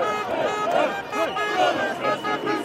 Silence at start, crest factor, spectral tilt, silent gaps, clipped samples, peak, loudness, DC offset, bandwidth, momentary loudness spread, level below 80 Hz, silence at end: 0 s; 14 dB; -3.5 dB/octave; none; under 0.1%; -8 dBFS; -23 LUFS; under 0.1%; 16 kHz; 4 LU; -64 dBFS; 0 s